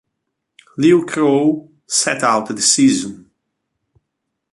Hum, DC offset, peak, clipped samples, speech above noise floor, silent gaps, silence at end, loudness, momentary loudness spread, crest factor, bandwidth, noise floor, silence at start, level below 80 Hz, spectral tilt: none; under 0.1%; 0 dBFS; under 0.1%; 61 dB; none; 1.35 s; -15 LUFS; 11 LU; 18 dB; 11.5 kHz; -76 dBFS; 0.75 s; -60 dBFS; -3.5 dB/octave